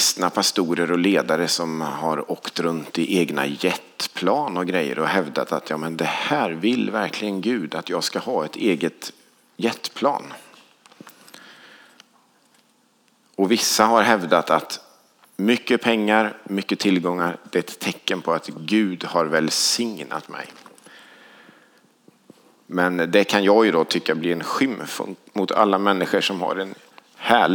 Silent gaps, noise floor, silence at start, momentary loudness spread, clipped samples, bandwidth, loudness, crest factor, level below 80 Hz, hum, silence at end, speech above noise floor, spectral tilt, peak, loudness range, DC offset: none; -61 dBFS; 0 s; 11 LU; under 0.1%; over 20 kHz; -21 LUFS; 22 dB; -78 dBFS; none; 0 s; 40 dB; -3.5 dB/octave; 0 dBFS; 7 LU; under 0.1%